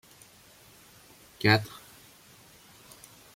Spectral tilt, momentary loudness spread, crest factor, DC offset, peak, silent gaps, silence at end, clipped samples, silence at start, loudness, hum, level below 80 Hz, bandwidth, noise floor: -5 dB/octave; 29 LU; 26 dB; under 0.1%; -8 dBFS; none; 1.65 s; under 0.1%; 1.45 s; -25 LUFS; none; -66 dBFS; 16.5 kHz; -56 dBFS